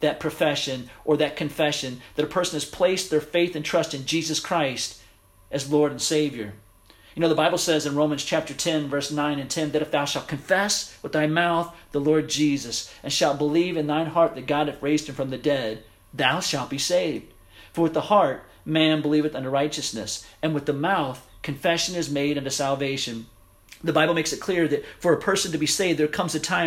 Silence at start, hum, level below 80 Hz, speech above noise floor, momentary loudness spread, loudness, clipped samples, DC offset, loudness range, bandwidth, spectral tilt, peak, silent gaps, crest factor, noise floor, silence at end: 0 s; none; -56 dBFS; 30 dB; 9 LU; -24 LUFS; under 0.1%; under 0.1%; 2 LU; 16 kHz; -4 dB/octave; -6 dBFS; none; 20 dB; -54 dBFS; 0 s